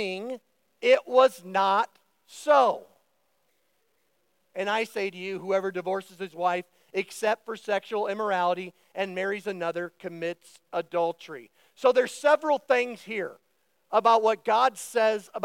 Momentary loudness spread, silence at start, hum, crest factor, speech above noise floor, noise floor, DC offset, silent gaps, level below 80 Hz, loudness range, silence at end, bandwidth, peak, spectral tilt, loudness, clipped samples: 13 LU; 0 s; none; 20 dB; 47 dB; -73 dBFS; under 0.1%; none; under -90 dBFS; 6 LU; 0 s; 16.5 kHz; -6 dBFS; -4 dB/octave; -26 LUFS; under 0.1%